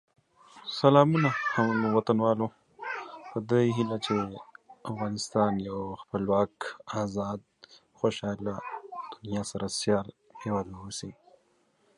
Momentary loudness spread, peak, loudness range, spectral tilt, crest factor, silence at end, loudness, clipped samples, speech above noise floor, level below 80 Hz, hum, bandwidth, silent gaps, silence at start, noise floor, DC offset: 15 LU; -6 dBFS; 8 LU; -6 dB/octave; 24 dB; 0.85 s; -29 LUFS; under 0.1%; 41 dB; -62 dBFS; none; 11.5 kHz; none; 0.55 s; -69 dBFS; under 0.1%